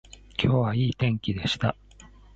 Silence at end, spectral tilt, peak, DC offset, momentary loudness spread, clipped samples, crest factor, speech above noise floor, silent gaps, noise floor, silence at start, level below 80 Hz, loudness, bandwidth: 0.3 s; -6.5 dB/octave; -8 dBFS; under 0.1%; 8 LU; under 0.1%; 20 dB; 26 dB; none; -50 dBFS; 0.4 s; -46 dBFS; -26 LUFS; 8 kHz